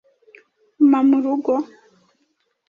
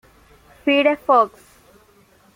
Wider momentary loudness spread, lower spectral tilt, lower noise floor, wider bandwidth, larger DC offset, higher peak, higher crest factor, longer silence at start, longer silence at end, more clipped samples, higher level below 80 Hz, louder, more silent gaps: about the same, 9 LU vs 8 LU; first, -7.5 dB/octave vs -4.5 dB/octave; first, -68 dBFS vs -54 dBFS; second, 4.9 kHz vs 16 kHz; neither; about the same, -6 dBFS vs -4 dBFS; about the same, 16 dB vs 18 dB; first, 0.8 s vs 0.65 s; about the same, 1.05 s vs 1.1 s; neither; second, -70 dBFS vs -60 dBFS; about the same, -18 LUFS vs -18 LUFS; neither